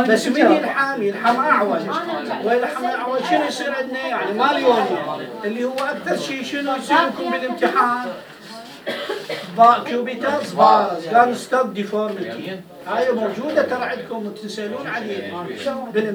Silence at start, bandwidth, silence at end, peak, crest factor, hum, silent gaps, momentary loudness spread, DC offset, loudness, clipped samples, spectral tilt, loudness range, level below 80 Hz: 0 s; over 20 kHz; 0 s; 0 dBFS; 20 dB; none; none; 13 LU; under 0.1%; -20 LUFS; under 0.1%; -4.5 dB/octave; 6 LU; -70 dBFS